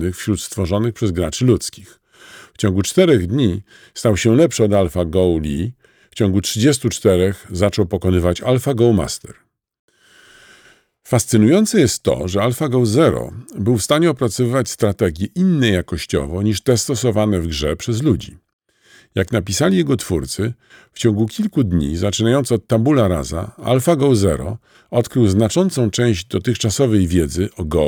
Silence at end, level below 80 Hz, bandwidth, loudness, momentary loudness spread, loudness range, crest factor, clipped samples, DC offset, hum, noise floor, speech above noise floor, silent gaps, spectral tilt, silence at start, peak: 0 s; -38 dBFS; 19.5 kHz; -17 LUFS; 8 LU; 3 LU; 16 dB; under 0.1%; under 0.1%; none; -51 dBFS; 35 dB; 9.79-9.88 s, 18.53-18.59 s; -5.5 dB/octave; 0 s; -2 dBFS